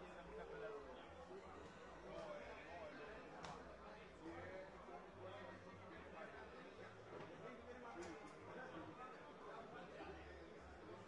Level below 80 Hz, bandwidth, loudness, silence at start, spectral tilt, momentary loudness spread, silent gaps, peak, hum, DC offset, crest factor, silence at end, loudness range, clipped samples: -72 dBFS; 10.5 kHz; -56 LUFS; 0 s; -5.5 dB/octave; 5 LU; none; -38 dBFS; none; under 0.1%; 18 dB; 0 s; 1 LU; under 0.1%